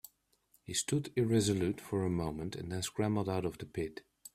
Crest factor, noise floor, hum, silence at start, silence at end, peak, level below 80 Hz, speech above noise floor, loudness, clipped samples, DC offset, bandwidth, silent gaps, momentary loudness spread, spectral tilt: 18 dB; -72 dBFS; none; 0.7 s; 0.05 s; -18 dBFS; -62 dBFS; 38 dB; -35 LUFS; under 0.1%; under 0.1%; 15.5 kHz; none; 11 LU; -5 dB/octave